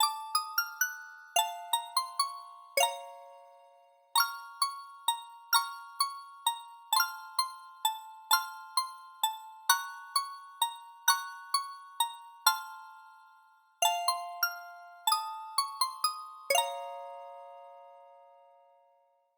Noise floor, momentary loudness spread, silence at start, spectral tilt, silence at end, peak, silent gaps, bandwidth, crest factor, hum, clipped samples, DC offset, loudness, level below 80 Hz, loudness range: -69 dBFS; 15 LU; 0 s; 5.5 dB/octave; 1.2 s; -8 dBFS; none; over 20 kHz; 26 dB; none; under 0.1%; under 0.1%; -32 LUFS; under -90 dBFS; 2 LU